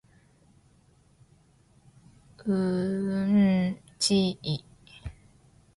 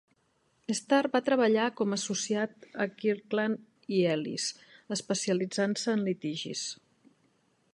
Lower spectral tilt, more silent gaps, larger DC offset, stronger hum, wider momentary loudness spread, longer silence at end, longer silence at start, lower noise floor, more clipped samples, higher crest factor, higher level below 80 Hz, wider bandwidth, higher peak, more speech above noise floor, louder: first, -5.5 dB/octave vs -4 dB/octave; neither; neither; neither; first, 22 LU vs 10 LU; second, 0.65 s vs 1 s; first, 2.4 s vs 0.7 s; second, -61 dBFS vs -72 dBFS; neither; about the same, 16 dB vs 18 dB; first, -56 dBFS vs -80 dBFS; about the same, 11.5 kHz vs 11.5 kHz; about the same, -12 dBFS vs -12 dBFS; second, 35 dB vs 42 dB; first, -27 LUFS vs -30 LUFS